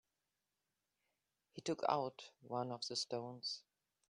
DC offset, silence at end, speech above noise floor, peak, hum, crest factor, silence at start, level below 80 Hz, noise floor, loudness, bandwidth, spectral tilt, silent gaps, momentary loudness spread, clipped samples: under 0.1%; 0.5 s; 47 dB; -20 dBFS; 50 Hz at -80 dBFS; 26 dB; 1.55 s; -88 dBFS; -90 dBFS; -43 LUFS; 10.5 kHz; -4 dB/octave; none; 11 LU; under 0.1%